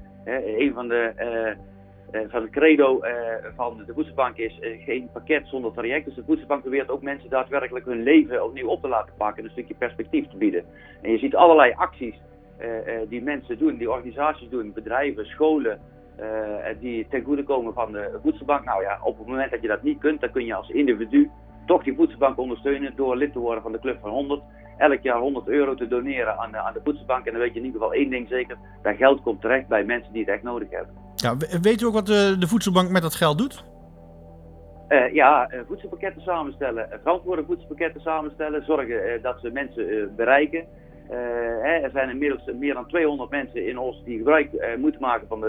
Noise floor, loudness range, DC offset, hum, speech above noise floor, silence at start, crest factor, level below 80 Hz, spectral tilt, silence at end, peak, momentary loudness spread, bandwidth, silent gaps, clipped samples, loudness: -45 dBFS; 5 LU; under 0.1%; none; 22 dB; 0 s; 24 dB; -50 dBFS; -6 dB/octave; 0 s; 0 dBFS; 12 LU; 15.5 kHz; none; under 0.1%; -24 LUFS